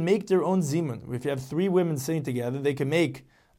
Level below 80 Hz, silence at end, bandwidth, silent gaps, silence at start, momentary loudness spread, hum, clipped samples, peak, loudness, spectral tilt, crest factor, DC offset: -64 dBFS; 0.35 s; 16.5 kHz; none; 0 s; 7 LU; none; under 0.1%; -10 dBFS; -27 LUFS; -6.5 dB/octave; 16 dB; under 0.1%